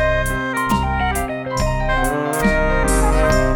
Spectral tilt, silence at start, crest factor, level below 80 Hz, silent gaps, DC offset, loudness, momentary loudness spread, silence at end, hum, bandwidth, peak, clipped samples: -5 dB/octave; 0 s; 14 dB; -22 dBFS; none; under 0.1%; -19 LUFS; 5 LU; 0 s; none; 19 kHz; -2 dBFS; under 0.1%